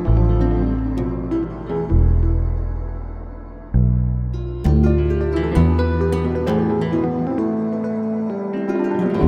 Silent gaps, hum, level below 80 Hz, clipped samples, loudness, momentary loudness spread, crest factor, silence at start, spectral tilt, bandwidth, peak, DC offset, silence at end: none; none; -22 dBFS; under 0.1%; -20 LUFS; 9 LU; 18 dB; 0 s; -9.5 dB/octave; 9.4 kHz; -2 dBFS; under 0.1%; 0 s